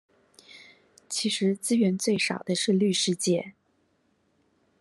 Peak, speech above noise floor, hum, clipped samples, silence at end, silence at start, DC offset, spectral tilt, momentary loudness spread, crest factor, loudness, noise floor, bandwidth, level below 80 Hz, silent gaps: -12 dBFS; 44 dB; none; under 0.1%; 1.3 s; 0.55 s; under 0.1%; -4 dB/octave; 6 LU; 16 dB; -26 LUFS; -70 dBFS; 13 kHz; -74 dBFS; none